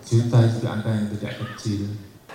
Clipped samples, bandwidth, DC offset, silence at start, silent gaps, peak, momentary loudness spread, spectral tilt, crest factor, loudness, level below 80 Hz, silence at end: under 0.1%; 10.5 kHz; under 0.1%; 0 s; none; -6 dBFS; 13 LU; -7 dB/octave; 16 dB; -23 LUFS; -56 dBFS; 0 s